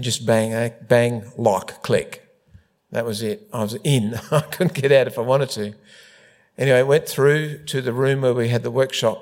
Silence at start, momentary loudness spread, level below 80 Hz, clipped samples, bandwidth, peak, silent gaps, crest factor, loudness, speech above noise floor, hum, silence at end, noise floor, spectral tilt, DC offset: 0 s; 10 LU; -62 dBFS; under 0.1%; 16.5 kHz; -2 dBFS; none; 18 dB; -20 LUFS; 33 dB; none; 0 s; -53 dBFS; -5.5 dB/octave; under 0.1%